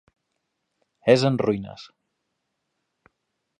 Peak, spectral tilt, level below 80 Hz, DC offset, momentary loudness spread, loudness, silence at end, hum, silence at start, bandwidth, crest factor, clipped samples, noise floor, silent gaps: -2 dBFS; -6.5 dB/octave; -64 dBFS; under 0.1%; 21 LU; -22 LUFS; 1.75 s; none; 1.05 s; 9.8 kHz; 24 dB; under 0.1%; -78 dBFS; none